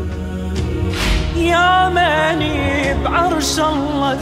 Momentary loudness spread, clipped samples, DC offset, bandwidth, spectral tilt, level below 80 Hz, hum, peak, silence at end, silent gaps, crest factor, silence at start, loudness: 9 LU; under 0.1%; under 0.1%; 16 kHz; -4.5 dB/octave; -26 dBFS; none; -2 dBFS; 0 s; none; 14 dB; 0 s; -16 LUFS